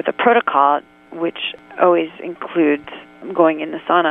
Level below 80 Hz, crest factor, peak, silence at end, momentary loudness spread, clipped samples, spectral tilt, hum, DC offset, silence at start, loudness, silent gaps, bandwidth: -66 dBFS; 18 dB; 0 dBFS; 0 s; 13 LU; under 0.1%; -7.5 dB/octave; none; under 0.1%; 0.05 s; -18 LUFS; none; 3.9 kHz